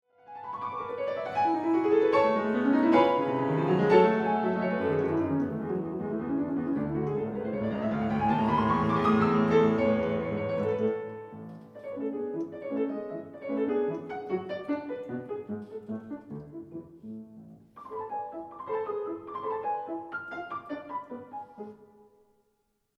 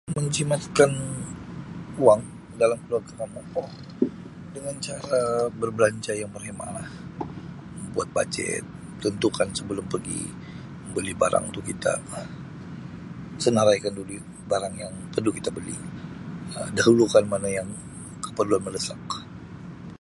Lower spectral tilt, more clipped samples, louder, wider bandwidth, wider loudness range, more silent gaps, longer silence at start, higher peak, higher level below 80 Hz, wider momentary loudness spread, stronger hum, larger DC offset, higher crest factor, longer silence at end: first, -8.5 dB/octave vs -5 dB/octave; neither; second, -29 LUFS vs -26 LUFS; second, 7.4 kHz vs 11.5 kHz; first, 14 LU vs 5 LU; neither; first, 0.3 s vs 0.05 s; second, -8 dBFS vs -2 dBFS; second, -60 dBFS vs -54 dBFS; about the same, 19 LU vs 18 LU; neither; neither; about the same, 20 dB vs 24 dB; first, 1.15 s vs 0.05 s